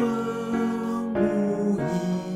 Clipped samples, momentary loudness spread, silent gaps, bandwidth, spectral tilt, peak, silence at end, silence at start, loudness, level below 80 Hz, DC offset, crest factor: under 0.1%; 4 LU; none; 14 kHz; -7.5 dB/octave; -12 dBFS; 0 s; 0 s; -26 LUFS; -56 dBFS; under 0.1%; 14 dB